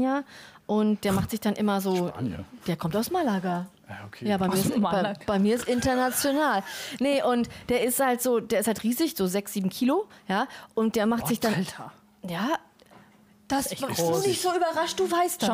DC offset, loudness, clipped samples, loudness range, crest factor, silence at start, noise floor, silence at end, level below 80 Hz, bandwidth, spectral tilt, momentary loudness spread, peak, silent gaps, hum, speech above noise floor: under 0.1%; -26 LUFS; under 0.1%; 4 LU; 14 dB; 0 s; -56 dBFS; 0 s; -56 dBFS; 16 kHz; -4.5 dB/octave; 9 LU; -12 dBFS; none; none; 30 dB